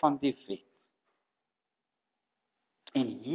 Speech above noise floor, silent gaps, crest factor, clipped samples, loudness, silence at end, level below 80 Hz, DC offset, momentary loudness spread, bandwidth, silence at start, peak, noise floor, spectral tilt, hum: 57 dB; none; 24 dB; under 0.1%; -34 LUFS; 0 s; -80 dBFS; under 0.1%; 12 LU; 4 kHz; 0.05 s; -12 dBFS; -88 dBFS; -5 dB/octave; none